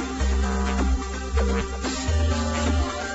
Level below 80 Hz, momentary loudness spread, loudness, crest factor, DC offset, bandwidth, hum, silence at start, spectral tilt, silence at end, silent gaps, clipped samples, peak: -26 dBFS; 4 LU; -25 LUFS; 14 dB; under 0.1%; 8.2 kHz; none; 0 s; -5 dB/octave; 0 s; none; under 0.1%; -10 dBFS